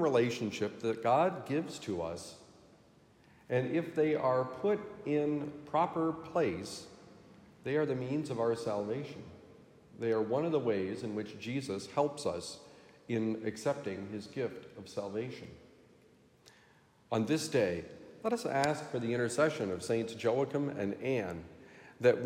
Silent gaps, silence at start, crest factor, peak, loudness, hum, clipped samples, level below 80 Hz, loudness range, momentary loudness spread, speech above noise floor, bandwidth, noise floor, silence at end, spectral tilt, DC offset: none; 0 s; 22 dB; -14 dBFS; -34 LUFS; none; under 0.1%; -74 dBFS; 6 LU; 14 LU; 31 dB; 15.5 kHz; -65 dBFS; 0 s; -6 dB/octave; under 0.1%